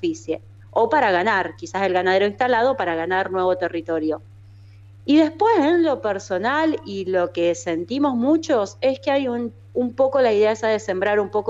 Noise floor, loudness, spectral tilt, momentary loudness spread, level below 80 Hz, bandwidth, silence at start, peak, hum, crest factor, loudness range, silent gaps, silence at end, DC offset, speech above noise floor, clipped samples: -44 dBFS; -21 LUFS; -5 dB/octave; 9 LU; -58 dBFS; 8 kHz; 0 s; -6 dBFS; none; 14 dB; 2 LU; none; 0 s; under 0.1%; 24 dB; under 0.1%